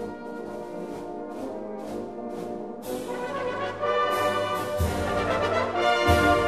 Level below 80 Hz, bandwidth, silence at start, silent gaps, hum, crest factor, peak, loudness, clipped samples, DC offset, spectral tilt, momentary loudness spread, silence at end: -42 dBFS; 14 kHz; 0 s; none; none; 18 dB; -8 dBFS; -27 LUFS; under 0.1%; 0.2%; -5 dB/octave; 13 LU; 0 s